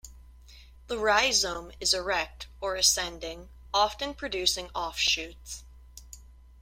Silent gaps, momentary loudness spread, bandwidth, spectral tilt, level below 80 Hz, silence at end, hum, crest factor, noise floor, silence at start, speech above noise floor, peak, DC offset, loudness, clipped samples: none; 19 LU; 16.5 kHz; -0.5 dB/octave; -50 dBFS; 0.2 s; none; 22 dB; -51 dBFS; 0.05 s; 22 dB; -8 dBFS; under 0.1%; -27 LUFS; under 0.1%